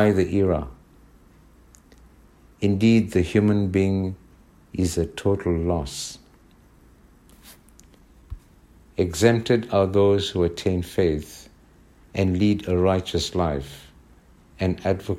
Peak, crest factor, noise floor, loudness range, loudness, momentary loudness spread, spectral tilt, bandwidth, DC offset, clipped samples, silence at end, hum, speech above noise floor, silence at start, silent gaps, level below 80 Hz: -4 dBFS; 20 dB; -53 dBFS; 7 LU; -23 LUFS; 20 LU; -6.5 dB/octave; 15 kHz; under 0.1%; under 0.1%; 0 s; none; 32 dB; 0 s; none; -44 dBFS